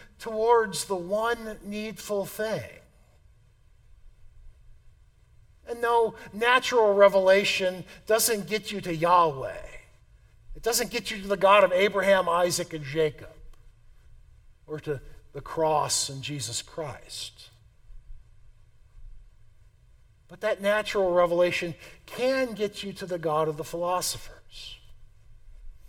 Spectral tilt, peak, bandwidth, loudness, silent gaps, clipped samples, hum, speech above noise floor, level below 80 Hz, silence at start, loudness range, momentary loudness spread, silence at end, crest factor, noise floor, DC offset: -3 dB/octave; -6 dBFS; 17.5 kHz; -26 LUFS; none; under 0.1%; none; 32 dB; -52 dBFS; 0 s; 13 LU; 17 LU; 0.1 s; 22 dB; -58 dBFS; under 0.1%